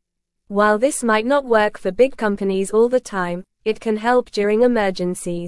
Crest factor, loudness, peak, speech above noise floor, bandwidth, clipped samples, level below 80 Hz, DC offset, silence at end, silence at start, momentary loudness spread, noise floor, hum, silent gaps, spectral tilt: 16 dB; -19 LUFS; -2 dBFS; 48 dB; 12 kHz; under 0.1%; -48 dBFS; under 0.1%; 0 s; 0.5 s; 8 LU; -66 dBFS; none; none; -5 dB/octave